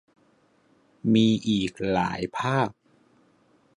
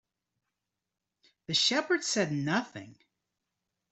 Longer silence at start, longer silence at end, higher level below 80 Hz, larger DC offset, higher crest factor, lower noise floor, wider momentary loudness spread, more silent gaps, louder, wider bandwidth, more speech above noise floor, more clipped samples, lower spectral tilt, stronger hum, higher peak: second, 1.05 s vs 1.5 s; about the same, 1.05 s vs 1 s; first, -56 dBFS vs -76 dBFS; neither; about the same, 18 dB vs 20 dB; second, -63 dBFS vs -87 dBFS; second, 8 LU vs 13 LU; neither; first, -25 LUFS vs -28 LUFS; first, 10.5 kHz vs 8.4 kHz; second, 40 dB vs 57 dB; neither; first, -6 dB/octave vs -3 dB/octave; neither; first, -10 dBFS vs -14 dBFS